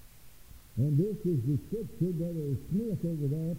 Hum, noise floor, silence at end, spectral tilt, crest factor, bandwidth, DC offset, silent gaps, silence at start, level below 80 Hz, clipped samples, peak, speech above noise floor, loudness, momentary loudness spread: none; -54 dBFS; 0 s; -9.5 dB/octave; 14 dB; 16 kHz; 0.2%; none; 0 s; -54 dBFS; under 0.1%; -18 dBFS; 23 dB; -32 LUFS; 5 LU